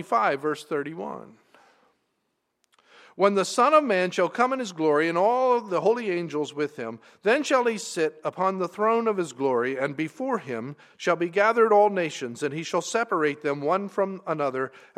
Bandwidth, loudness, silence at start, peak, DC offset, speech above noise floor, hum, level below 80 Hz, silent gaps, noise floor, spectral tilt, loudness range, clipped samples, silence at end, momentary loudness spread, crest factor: 13.5 kHz; -25 LUFS; 0 s; -6 dBFS; under 0.1%; 52 dB; none; -82 dBFS; none; -77 dBFS; -4.5 dB/octave; 4 LU; under 0.1%; 0.2 s; 10 LU; 20 dB